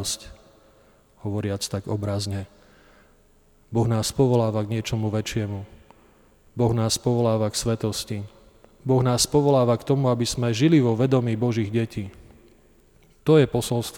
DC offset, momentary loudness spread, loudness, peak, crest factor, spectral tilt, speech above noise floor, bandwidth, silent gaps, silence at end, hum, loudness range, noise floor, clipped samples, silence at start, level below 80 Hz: under 0.1%; 14 LU; -23 LUFS; -6 dBFS; 18 dB; -5.5 dB/octave; 35 dB; 18.5 kHz; none; 0 s; none; 7 LU; -57 dBFS; under 0.1%; 0 s; -50 dBFS